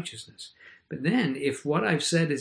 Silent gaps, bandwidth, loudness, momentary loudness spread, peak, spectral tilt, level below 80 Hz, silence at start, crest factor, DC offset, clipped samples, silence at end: none; 10.5 kHz; -26 LUFS; 19 LU; -10 dBFS; -5 dB/octave; -70 dBFS; 0 s; 18 dB; under 0.1%; under 0.1%; 0 s